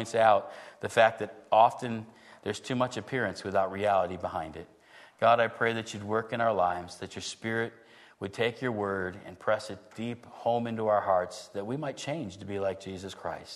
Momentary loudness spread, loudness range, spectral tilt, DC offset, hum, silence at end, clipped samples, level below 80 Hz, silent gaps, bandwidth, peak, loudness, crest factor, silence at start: 15 LU; 5 LU; -5 dB/octave; under 0.1%; none; 0 s; under 0.1%; -68 dBFS; none; 12.5 kHz; -8 dBFS; -30 LUFS; 22 dB; 0 s